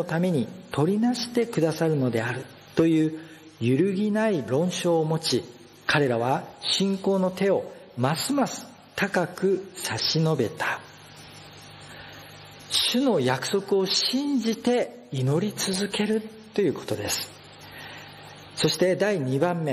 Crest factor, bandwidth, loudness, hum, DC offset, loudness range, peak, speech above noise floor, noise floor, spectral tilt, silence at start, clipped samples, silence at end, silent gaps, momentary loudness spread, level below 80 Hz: 18 dB; 13 kHz; -25 LUFS; none; under 0.1%; 3 LU; -8 dBFS; 22 dB; -46 dBFS; -5 dB/octave; 0 s; under 0.1%; 0 s; none; 20 LU; -66 dBFS